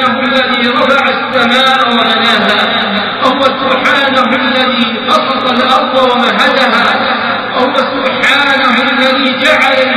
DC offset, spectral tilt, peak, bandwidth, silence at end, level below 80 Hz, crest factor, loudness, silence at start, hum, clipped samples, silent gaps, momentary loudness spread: 0.1%; -4 dB/octave; 0 dBFS; 15 kHz; 0 s; -50 dBFS; 10 dB; -9 LUFS; 0 s; none; under 0.1%; none; 4 LU